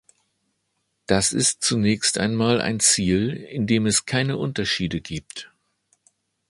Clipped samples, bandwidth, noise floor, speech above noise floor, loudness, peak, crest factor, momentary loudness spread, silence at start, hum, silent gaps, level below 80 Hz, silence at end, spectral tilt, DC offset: under 0.1%; 11.5 kHz; -74 dBFS; 52 dB; -21 LUFS; -2 dBFS; 20 dB; 13 LU; 1.1 s; none; none; -48 dBFS; 1.05 s; -3.5 dB/octave; under 0.1%